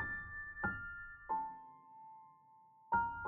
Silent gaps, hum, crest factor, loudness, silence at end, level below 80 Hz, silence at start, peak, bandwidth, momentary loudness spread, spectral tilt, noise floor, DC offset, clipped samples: none; none; 20 dB; -42 LUFS; 0 s; -62 dBFS; 0 s; -24 dBFS; 3.8 kHz; 20 LU; -5 dB/octave; -65 dBFS; under 0.1%; under 0.1%